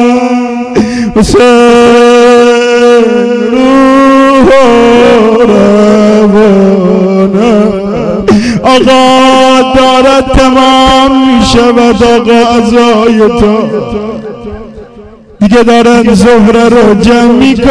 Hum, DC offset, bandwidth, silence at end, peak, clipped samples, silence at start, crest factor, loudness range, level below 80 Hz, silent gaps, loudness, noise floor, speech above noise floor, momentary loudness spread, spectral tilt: none; 1%; 11 kHz; 0 s; 0 dBFS; 20%; 0 s; 4 dB; 4 LU; -24 dBFS; none; -4 LUFS; -30 dBFS; 27 dB; 7 LU; -5.5 dB/octave